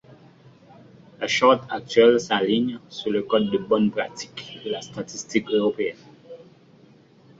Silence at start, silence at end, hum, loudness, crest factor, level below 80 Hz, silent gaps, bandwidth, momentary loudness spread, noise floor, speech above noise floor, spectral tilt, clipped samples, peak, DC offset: 1.2 s; 1 s; none; -22 LUFS; 20 dB; -64 dBFS; none; 7.8 kHz; 15 LU; -53 dBFS; 31 dB; -4.5 dB/octave; under 0.1%; -4 dBFS; under 0.1%